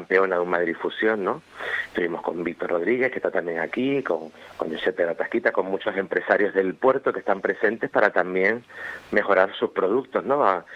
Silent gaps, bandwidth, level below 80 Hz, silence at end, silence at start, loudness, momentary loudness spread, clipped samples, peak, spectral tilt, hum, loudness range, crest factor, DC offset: none; 8.4 kHz; -66 dBFS; 0 s; 0 s; -24 LUFS; 8 LU; under 0.1%; -2 dBFS; -6.5 dB/octave; none; 3 LU; 22 dB; under 0.1%